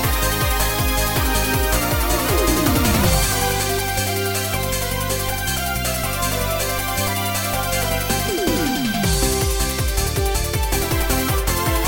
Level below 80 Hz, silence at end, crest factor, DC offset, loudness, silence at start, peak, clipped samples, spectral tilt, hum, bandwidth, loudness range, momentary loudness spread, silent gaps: -26 dBFS; 0 s; 14 dB; under 0.1%; -19 LUFS; 0 s; -4 dBFS; under 0.1%; -3.5 dB/octave; none; 17 kHz; 3 LU; 4 LU; none